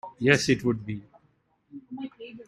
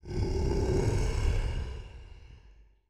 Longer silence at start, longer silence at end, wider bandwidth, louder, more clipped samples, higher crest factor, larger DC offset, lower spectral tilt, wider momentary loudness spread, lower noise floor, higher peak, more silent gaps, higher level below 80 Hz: about the same, 0.05 s vs 0.05 s; second, 0.05 s vs 0.3 s; first, 15.5 kHz vs 11.5 kHz; first, -24 LUFS vs -31 LUFS; neither; first, 24 dB vs 16 dB; neither; second, -5 dB/octave vs -6.5 dB/octave; about the same, 18 LU vs 20 LU; first, -68 dBFS vs -57 dBFS; first, -6 dBFS vs -16 dBFS; neither; second, -60 dBFS vs -34 dBFS